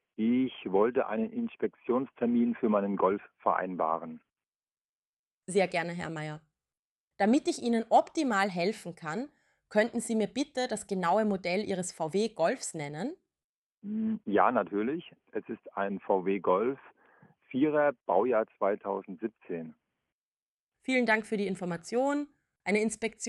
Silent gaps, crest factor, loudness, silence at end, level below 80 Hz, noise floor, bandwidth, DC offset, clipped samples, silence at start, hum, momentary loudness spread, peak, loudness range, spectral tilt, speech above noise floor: 4.48-4.60 s, 4.81-5.41 s, 6.79-7.11 s, 13.44-13.82 s, 20.12-20.67 s; 22 dB; -30 LUFS; 0 s; -72 dBFS; under -90 dBFS; 12 kHz; under 0.1%; under 0.1%; 0.2 s; none; 13 LU; -10 dBFS; 3 LU; -5 dB/octave; over 60 dB